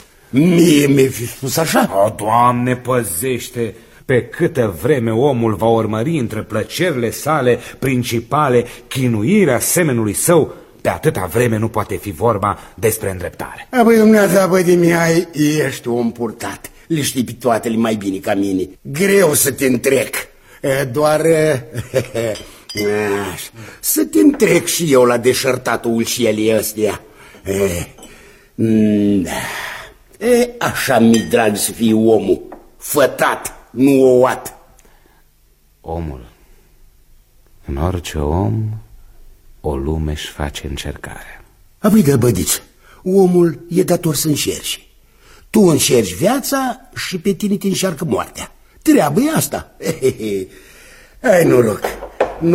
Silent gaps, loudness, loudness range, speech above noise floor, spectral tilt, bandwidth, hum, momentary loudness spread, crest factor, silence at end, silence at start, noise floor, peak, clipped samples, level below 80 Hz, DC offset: none; -15 LUFS; 6 LU; 38 dB; -5 dB/octave; 16.5 kHz; none; 14 LU; 16 dB; 0 s; 0.35 s; -52 dBFS; 0 dBFS; under 0.1%; -38 dBFS; under 0.1%